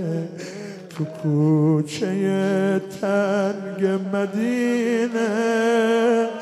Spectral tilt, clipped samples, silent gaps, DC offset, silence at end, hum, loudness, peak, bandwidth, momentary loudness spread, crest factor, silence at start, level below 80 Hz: -6.5 dB/octave; under 0.1%; none; under 0.1%; 0 s; none; -21 LUFS; -8 dBFS; 13.5 kHz; 12 LU; 12 dB; 0 s; -72 dBFS